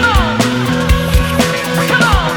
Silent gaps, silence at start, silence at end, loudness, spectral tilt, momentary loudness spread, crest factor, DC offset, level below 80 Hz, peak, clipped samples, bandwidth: none; 0 s; 0 s; -13 LUFS; -5 dB/octave; 3 LU; 12 dB; under 0.1%; -18 dBFS; 0 dBFS; under 0.1%; 19 kHz